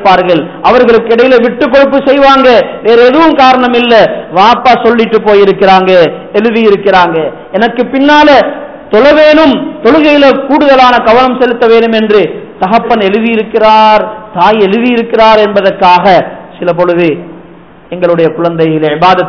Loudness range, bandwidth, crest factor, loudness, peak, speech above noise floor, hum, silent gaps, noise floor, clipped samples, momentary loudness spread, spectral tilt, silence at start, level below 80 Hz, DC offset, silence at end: 3 LU; 5.4 kHz; 6 dB; -6 LUFS; 0 dBFS; 28 dB; none; none; -33 dBFS; 20%; 7 LU; -6.5 dB/octave; 0 s; -38 dBFS; under 0.1%; 0 s